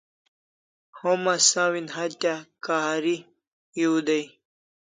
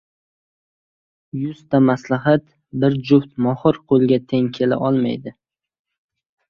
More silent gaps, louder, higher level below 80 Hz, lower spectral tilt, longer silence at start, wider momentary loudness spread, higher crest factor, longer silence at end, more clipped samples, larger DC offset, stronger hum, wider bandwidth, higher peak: first, 3.47-3.72 s vs none; second, -24 LUFS vs -18 LUFS; second, -80 dBFS vs -58 dBFS; second, -2 dB/octave vs -8.5 dB/octave; second, 0.95 s vs 1.35 s; about the same, 13 LU vs 11 LU; about the same, 20 dB vs 18 dB; second, 0.6 s vs 1.2 s; neither; neither; neither; first, 9.6 kHz vs 6.8 kHz; second, -6 dBFS vs -2 dBFS